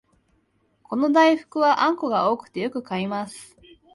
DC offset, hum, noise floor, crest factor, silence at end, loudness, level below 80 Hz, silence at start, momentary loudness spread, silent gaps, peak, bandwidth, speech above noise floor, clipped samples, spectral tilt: under 0.1%; none; -66 dBFS; 18 dB; 0.5 s; -22 LUFS; -68 dBFS; 0.9 s; 13 LU; none; -4 dBFS; 11.5 kHz; 45 dB; under 0.1%; -5.5 dB/octave